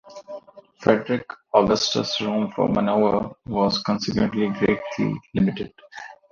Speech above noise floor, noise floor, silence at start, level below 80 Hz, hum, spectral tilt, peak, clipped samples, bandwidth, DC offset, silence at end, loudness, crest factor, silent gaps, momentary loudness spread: 20 dB; -42 dBFS; 0.05 s; -50 dBFS; none; -5.5 dB/octave; -2 dBFS; under 0.1%; 7.2 kHz; under 0.1%; 0.15 s; -22 LUFS; 20 dB; none; 19 LU